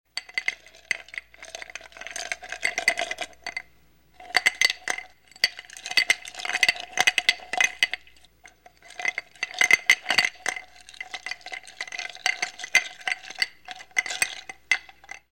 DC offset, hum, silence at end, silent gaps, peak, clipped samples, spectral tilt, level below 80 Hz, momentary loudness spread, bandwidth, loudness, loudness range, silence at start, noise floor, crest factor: 0.1%; none; 0.15 s; none; -4 dBFS; under 0.1%; 1.5 dB/octave; -66 dBFS; 18 LU; 17.5 kHz; -25 LUFS; 6 LU; 0.15 s; -60 dBFS; 24 dB